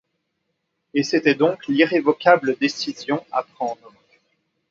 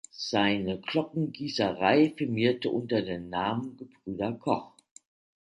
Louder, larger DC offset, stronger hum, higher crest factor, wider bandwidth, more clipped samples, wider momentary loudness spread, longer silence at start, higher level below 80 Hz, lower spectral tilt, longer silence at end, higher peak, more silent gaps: first, -20 LUFS vs -29 LUFS; neither; neither; about the same, 22 dB vs 20 dB; second, 7.6 kHz vs 11 kHz; neither; about the same, 12 LU vs 10 LU; first, 0.95 s vs 0.15 s; second, -70 dBFS vs -62 dBFS; about the same, -5 dB/octave vs -6 dB/octave; first, 0.95 s vs 0.8 s; first, 0 dBFS vs -10 dBFS; neither